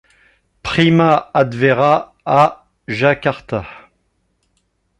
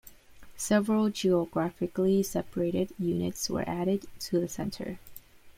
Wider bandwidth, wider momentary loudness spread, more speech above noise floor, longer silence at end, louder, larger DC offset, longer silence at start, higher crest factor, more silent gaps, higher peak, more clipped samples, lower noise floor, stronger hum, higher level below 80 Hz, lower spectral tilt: second, 10.5 kHz vs 16.5 kHz; first, 13 LU vs 9 LU; first, 51 dB vs 21 dB; first, 1.2 s vs 0.05 s; first, -15 LUFS vs -30 LUFS; neither; first, 0.65 s vs 0.05 s; about the same, 16 dB vs 20 dB; neither; first, 0 dBFS vs -10 dBFS; neither; first, -65 dBFS vs -50 dBFS; neither; first, -48 dBFS vs -56 dBFS; first, -7 dB/octave vs -5.5 dB/octave